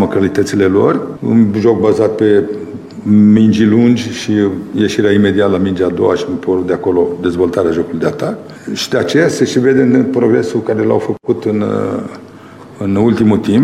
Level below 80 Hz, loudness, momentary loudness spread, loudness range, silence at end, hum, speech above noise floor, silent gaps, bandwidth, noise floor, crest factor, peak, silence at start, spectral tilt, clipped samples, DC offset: -48 dBFS; -12 LUFS; 10 LU; 4 LU; 0 s; none; 23 dB; none; 12.5 kHz; -34 dBFS; 12 dB; 0 dBFS; 0 s; -6.5 dB/octave; under 0.1%; under 0.1%